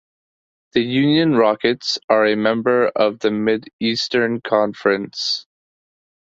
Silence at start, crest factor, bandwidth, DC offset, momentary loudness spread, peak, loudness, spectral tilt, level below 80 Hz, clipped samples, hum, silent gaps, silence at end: 0.75 s; 18 dB; 7.8 kHz; under 0.1%; 6 LU; -2 dBFS; -18 LUFS; -5 dB/octave; -62 dBFS; under 0.1%; none; 2.04-2.08 s, 3.73-3.79 s; 0.9 s